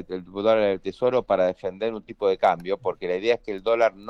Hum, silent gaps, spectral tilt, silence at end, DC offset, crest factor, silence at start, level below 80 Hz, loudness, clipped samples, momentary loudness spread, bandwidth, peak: none; none; -6 dB/octave; 0 s; under 0.1%; 16 dB; 0 s; -56 dBFS; -24 LUFS; under 0.1%; 8 LU; 7.2 kHz; -8 dBFS